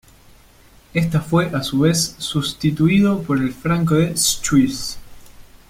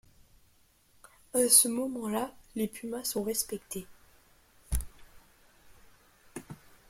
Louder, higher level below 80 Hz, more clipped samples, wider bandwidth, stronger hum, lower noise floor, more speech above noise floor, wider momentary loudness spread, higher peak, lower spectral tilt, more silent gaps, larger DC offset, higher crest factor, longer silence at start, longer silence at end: first, -18 LUFS vs -29 LUFS; about the same, -44 dBFS vs -48 dBFS; neither; about the same, 16 kHz vs 16.5 kHz; neither; second, -49 dBFS vs -66 dBFS; second, 31 dB vs 36 dB; second, 7 LU vs 26 LU; about the same, -4 dBFS vs -6 dBFS; first, -5 dB/octave vs -2.5 dB/octave; neither; neither; second, 16 dB vs 28 dB; second, 0.95 s vs 1.35 s; about the same, 0.3 s vs 0.35 s